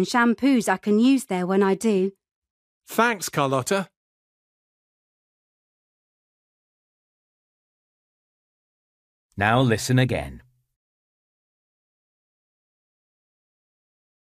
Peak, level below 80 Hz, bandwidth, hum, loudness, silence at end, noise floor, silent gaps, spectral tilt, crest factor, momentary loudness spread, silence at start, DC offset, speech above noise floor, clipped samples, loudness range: -4 dBFS; -56 dBFS; 15.5 kHz; none; -22 LUFS; 3.8 s; under -90 dBFS; 2.31-2.42 s, 2.50-2.81 s, 3.97-9.29 s; -5.5 dB/octave; 22 dB; 10 LU; 0 s; under 0.1%; over 69 dB; under 0.1%; 8 LU